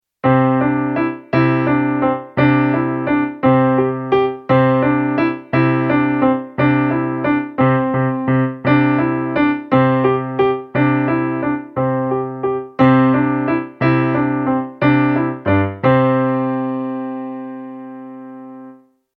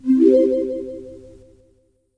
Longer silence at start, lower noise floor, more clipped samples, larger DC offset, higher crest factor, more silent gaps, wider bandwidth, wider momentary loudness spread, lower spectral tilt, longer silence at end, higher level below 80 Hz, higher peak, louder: first, 0.25 s vs 0.05 s; second, -43 dBFS vs -60 dBFS; neither; neither; about the same, 16 dB vs 18 dB; neither; second, 5.2 kHz vs 6.2 kHz; second, 8 LU vs 22 LU; first, -10.5 dB/octave vs -8 dB/octave; second, 0.45 s vs 1 s; about the same, -50 dBFS vs -54 dBFS; about the same, 0 dBFS vs -2 dBFS; about the same, -16 LUFS vs -17 LUFS